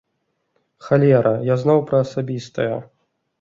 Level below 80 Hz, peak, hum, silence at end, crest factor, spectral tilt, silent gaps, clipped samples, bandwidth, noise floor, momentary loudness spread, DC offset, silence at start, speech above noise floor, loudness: -58 dBFS; -2 dBFS; none; 0.55 s; 18 dB; -8.5 dB/octave; none; under 0.1%; 7.6 kHz; -72 dBFS; 11 LU; under 0.1%; 0.85 s; 54 dB; -18 LUFS